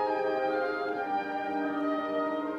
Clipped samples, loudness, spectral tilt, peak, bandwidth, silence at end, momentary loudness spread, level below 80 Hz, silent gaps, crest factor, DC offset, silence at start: under 0.1%; -31 LUFS; -6 dB/octave; -18 dBFS; 7.2 kHz; 0 s; 3 LU; -74 dBFS; none; 12 dB; under 0.1%; 0 s